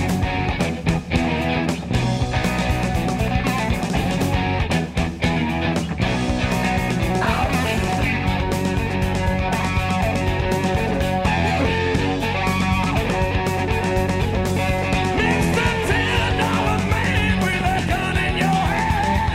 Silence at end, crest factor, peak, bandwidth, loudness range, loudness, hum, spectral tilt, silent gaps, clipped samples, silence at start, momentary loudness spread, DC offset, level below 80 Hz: 0 s; 14 dB; -4 dBFS; 16 kHz; 2 LU; -20 LUFS; none; -5.5 dB/octave; none; under 0.1%; 0 s; 3 LU; under 0.1%; -30 dBFS